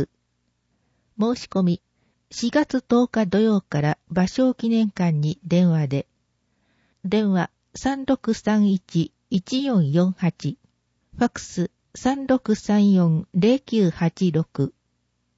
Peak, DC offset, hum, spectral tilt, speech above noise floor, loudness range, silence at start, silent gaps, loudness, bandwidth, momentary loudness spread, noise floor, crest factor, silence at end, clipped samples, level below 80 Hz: -6 dBFS; under 0.1%; none; -7 dB/octave; 51 dB; 3 LU; 0 s; none; -22 LUFS; 8 kHz; 9 LU; -71 dBFS; 16 dB; 0.7 s; under 0.1%; -56 dBFS